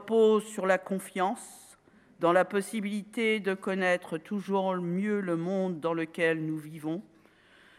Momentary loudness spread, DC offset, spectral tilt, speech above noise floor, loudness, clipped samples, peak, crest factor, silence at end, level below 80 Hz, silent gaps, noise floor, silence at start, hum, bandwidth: 11 LU; under 0.1%; -5.5 dB/octave; 31 dB; -29 LUFS; under 0.1%; -10 dBFS; 20 dB; 0.75 s; -80 dBFS; none; -60 dBFS; 0 s; none; 15 kHz